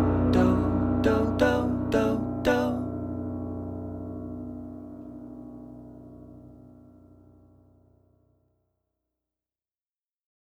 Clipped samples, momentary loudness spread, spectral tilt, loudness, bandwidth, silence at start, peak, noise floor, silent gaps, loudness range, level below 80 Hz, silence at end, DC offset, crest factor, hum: under 0.1%; 22 LU; -7.5 dB/octave; -27 LUFS; 13.5 kHz; 0 s; -8 dBFS; under -90 dBFS; none; 23 LU; -44 dBFS; 3.8 s; under 0.1%; 22 dB; none